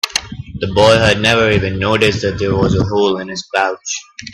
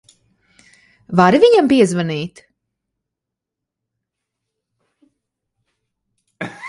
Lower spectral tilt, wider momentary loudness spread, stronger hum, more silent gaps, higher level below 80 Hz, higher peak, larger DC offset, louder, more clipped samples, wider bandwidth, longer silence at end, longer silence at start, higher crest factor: second, -4.5 dB/octave vs -6 dB/octave; second, 12 LU vs 20 LU; neither; neither; first, -36 dBFS vs -60 dBFS; about the same, 0 dBFS vs 0 dBFS; neither; about the same, -14 LUFS vs -14 LUFS; neither; first, 14 kHz vs 11.5 kHz; about the same, 0 s vs 0 s; second, 0.05 s vs 1.1 s; second, 14 dB vs 20 dB